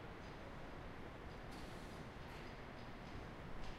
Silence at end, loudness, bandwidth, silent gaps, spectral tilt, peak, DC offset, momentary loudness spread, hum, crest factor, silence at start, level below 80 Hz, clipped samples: 0 s; -53 LUFS; 15 kHz; none; -5.5 dB/octave; -36 dBFS; under 0.1%; 1 LU; none; 16 dB; 0 s; -56 dBFS; under 0.1%